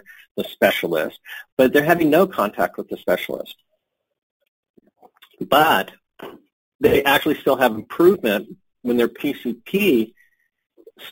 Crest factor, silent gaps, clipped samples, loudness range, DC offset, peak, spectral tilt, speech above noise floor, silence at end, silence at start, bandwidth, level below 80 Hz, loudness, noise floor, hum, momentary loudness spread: 20 dB; 1.52-1.57 s, 4.23-4.40 s, 4.48-4.63 s, 4.70-4.74 s, 6.53-6.79 s; under 0.1%; 5 LU; under 0.1%; -2 dBFS; -5 dB/octave; 54 dB; 0 s; 0.35 s; 17 kHz; -54 dBFS; -19 LUFS; -73 dBFS; none; 19 LU